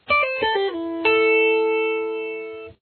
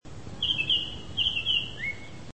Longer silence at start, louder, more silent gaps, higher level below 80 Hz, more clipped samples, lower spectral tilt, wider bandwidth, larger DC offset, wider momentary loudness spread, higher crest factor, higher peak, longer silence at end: about the same, 0.1 s vs 0 s; first, -20 LUFS vs -27 LUFS; neither; second, -58 dBFS vs -50 dBFS; neither; first, -6.5 dB/octave vs -2.5 dB/octave; second, 4.5 kHz vs 8.8 kHz; second, under 0.1% vs 0.7%; about the same, 13 LU vs 11 LU; about the same, 14 dB vs 16 dB; first, -8 dBFS vs -14 dBFS; about the same, 0.1 s vs 0 s